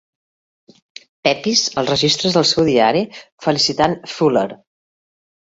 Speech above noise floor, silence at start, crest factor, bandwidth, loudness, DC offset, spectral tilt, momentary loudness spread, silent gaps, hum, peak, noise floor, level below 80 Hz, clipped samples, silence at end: over 73 dB; 1.25 s; 16 dB; 8 kHz; -16 LUFS; under 0.1%; -3.5 dB/octave; 7 LU; 3.32-3.38 s; none; -2 dBFS; under -90 dBFS; -52 dBFS; under 0.1%; 1 s